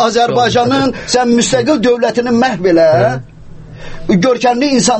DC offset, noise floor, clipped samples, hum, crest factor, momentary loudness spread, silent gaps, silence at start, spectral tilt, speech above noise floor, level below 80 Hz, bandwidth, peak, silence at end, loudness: under 0.1%; -31 dBFS; under 0.1%; none; 12 dB; 5 LU; none; 0 s; -4.5 dB/octave; 20 dB; -38 dBFS; 8.8 kHz; 0 dBFS; 0 s; -11 LUFS